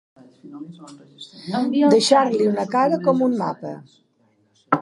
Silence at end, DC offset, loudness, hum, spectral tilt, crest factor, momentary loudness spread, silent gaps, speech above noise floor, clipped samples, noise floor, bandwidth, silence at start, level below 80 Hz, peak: 0 s; under 0.1%; -19 LUFS; none; -5 dB/octave; 20 dB; 23 LU; none; 42 dB; under 0.1%; -62 dBFS; 11.5 kHz; 0.45 s; -74 dBFS; -2 dBFS